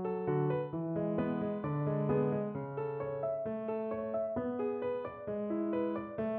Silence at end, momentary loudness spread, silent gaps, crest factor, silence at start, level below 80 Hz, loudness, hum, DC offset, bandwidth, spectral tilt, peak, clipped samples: 0 s; 6 LU; none; 14 dB; 0 s; -66 dBFS; -36 LUFS; none; under 0.1%; 4.3 kHz; -9 dB/octave; -20 dBFS; under 0.1%